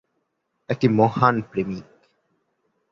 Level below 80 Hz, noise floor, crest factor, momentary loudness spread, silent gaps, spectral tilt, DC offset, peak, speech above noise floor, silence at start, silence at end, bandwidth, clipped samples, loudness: -58 dBFS; -74 dBFS; 22 dB; 13 LU; none; -8.5 dB/octave; under 0.1%; -2 dBFS; 54 dB; 0.7 s; 1.1 s; 7.2 kHz; under 0.1%; -21 LUFS